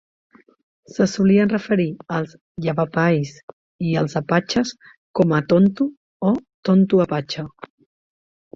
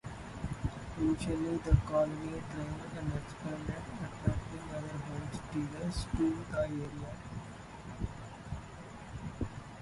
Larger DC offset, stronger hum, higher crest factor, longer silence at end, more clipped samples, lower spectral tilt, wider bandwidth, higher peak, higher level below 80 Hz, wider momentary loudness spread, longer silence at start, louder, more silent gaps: neither; neither; second, 16 dB vs 26 dB; first, 1.05 s vs 0 s; neither; about the same, -7 dB/octave vs -7 dB/octave; second, 7.6 kHz vs 11.5 kHz; first, -4 dBFS vs -12 dBFS; second, -56 dBFS vs -44 dBFS; about the same, 12 LU vs 13 LU; first, 1 s vs 0.05 s; first, -20 LUFS vs -38 LUFS; first, 2.41-2.55 s, 3.43-3.79 s, 4.97-5.14 s, 5.97-6.20 s, 6.54-6.63 s vs none